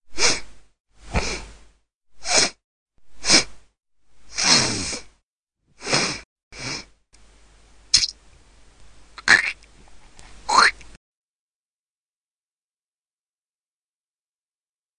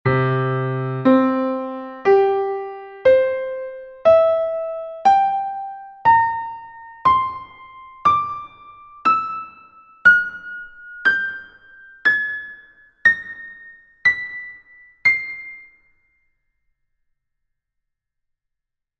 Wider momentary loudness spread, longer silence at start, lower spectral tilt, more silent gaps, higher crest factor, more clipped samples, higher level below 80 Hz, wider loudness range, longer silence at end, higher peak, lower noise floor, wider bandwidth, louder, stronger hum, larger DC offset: about the same, 18 LU vs 18 LU; about the same, 0.1 s vs 0.05 s; second, -1 dB/octave vs -7.5 dB/octave; first, 0.80-0.85 s, 1.95-2.01 s, 2.64-2.86 s, 5.23-5.47 s, 6.25-6.36 s, 6.43-6.51 s vs none; first, 26 dB vs 20 dB; neither; first, -46 dBFS vs -56 dBFS; about the same, 5 LU vs 5 LU; first, 4.05 s vs 3.4 s; about the same, 0 dBFS vs -2 dBFS; first, under -90 dBFS vs -81 dBFS; first, 11 kHz vs 8 kHz; about the same, -19 LUFS vs -18 LUFS; neither; neither